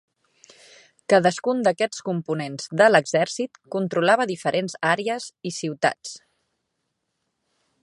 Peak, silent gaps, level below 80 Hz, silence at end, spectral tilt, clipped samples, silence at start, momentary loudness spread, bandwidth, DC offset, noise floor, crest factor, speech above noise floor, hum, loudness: -2 dBFS; none; -74 dBFS; 1.65 s; -4.5 dB/octave; under 0.1%; 1.1 s; 12 LU; 11.5 kHz; under 0.1%; -77 dBFS; 22 dB; 55 dB; none; -22 LUFS